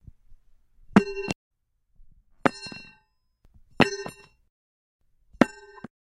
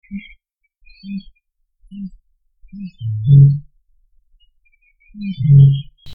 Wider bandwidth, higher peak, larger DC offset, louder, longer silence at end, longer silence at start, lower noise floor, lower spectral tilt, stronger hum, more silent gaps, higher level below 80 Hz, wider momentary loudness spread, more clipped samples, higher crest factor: first, 12 kHz vs 3.7 kHz; about the same, 0 dBFS vs 0 dBFS; neither; second, -26 LUFS vs -13 LUFS; first, 0.55 s vs 0 s; first, 0.3 s vs 0.1 s; first, -67 dBFS vs -60 dBFS; second, -5.5 dB/octave vs -11.5 dB/octave; neither; first, 1.35-1.51 s, 4.50-4.99 s vs none; second, -54 dBFS vs -44 dBFS; second, 19 LU vs 23 LU; neither; first, 30 dB vs 16 dB